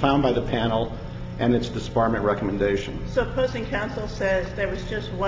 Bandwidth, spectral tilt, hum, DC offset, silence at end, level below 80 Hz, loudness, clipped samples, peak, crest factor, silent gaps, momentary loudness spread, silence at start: 7.8 kHz; -7 dB/octave; none; under 0.1%; 0 s; -36 dBFS; -25 LUFS; under 0.1%; -6 dBFS; 18 dB; none; 8 LU; 0 s